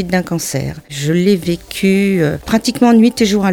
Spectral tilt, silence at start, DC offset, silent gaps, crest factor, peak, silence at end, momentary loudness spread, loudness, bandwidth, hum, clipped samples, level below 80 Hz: -5.5 dB/octave; 0 s; under 0.1%; none; 12 dB; -2 dBFS; 0 s; 10 LU; -14 LUFS; 17.5 kHz; none; under 0.1%; -40 dBFS